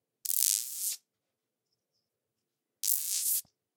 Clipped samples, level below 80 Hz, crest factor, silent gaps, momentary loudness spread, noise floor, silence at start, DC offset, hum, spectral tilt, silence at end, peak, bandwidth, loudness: under 0.1%; under -90 dBFS; 34 dB; none; 8 LU; -87 dBFS; 0.25 s; under 0.1%; none; 6 dB/octave; 0.35 s; -2 dBFS; 19 kHz; -29 LUFS